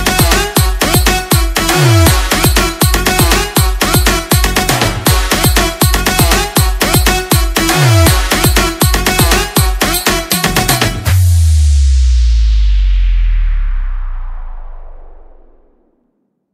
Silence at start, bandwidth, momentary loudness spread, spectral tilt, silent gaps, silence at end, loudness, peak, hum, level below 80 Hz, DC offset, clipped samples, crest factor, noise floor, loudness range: 0 s; 16.5 kHz; 5 LU; -4 dB/octave; none; 1.3 s; -11 LUFS; 0 dBFS; none; -14 dBFS; under 0.1%; 0.2%; 10 dB; -62 dBFS; 6 LU